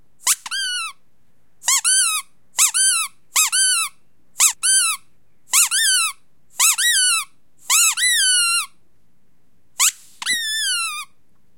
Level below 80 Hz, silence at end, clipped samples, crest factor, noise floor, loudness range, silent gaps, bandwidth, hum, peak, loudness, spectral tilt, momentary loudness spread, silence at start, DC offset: -72 dBFS; 0.55 s; under 0.1%; 20 dB; -65 dBFS; 2 LU; none; 16.5 kHz; none; 0 dBFS; -16 LUFS; 5.5 dB/octave; 12 LU; 0.25 s; 0.5%